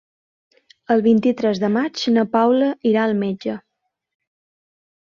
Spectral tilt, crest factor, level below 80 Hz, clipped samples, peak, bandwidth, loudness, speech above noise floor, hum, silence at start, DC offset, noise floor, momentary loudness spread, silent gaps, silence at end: -6.5 dB/octave; 16 dB; -64 dBFS; under 0.1%; -4 dBFS; 7.2 kHz; -19 LUFS; 59 dB; none; 0.9 s; under 0.1%; -76 dBFS; 9 LU; none; 1.45 s